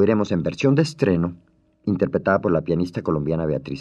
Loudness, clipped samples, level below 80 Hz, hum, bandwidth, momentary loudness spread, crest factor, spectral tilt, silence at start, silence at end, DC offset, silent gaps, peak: -22 LUFS; under 0.1%; -50 dBFS; none; 9.8 kHz; 6 LU; 16 dB; -7.5 dB/octave; 0 s; 0 s; under 0.1%; none; -4 dBFS